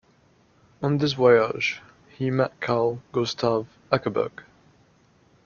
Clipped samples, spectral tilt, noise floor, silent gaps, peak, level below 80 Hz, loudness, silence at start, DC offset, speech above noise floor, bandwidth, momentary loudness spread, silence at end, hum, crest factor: under 0.1%; -6 dB/octave; -60 dBFS; none; -4 dBFS; -62 dBFS; -24 LUFS; 0.8 s; under 0.1%; 37 dB; 7 kHz; 11 LU; 1.05 s; none; 22 dB